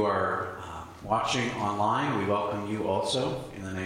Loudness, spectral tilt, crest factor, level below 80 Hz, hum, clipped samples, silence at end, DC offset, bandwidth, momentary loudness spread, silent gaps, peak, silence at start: -29 LUFS; -5 dB/octave; 16 dB; -56 dBFS; none; under 0.1%; 0 s; under 0.1%; 16 kHz; 10 LU; none; -12 dBFS; 0 s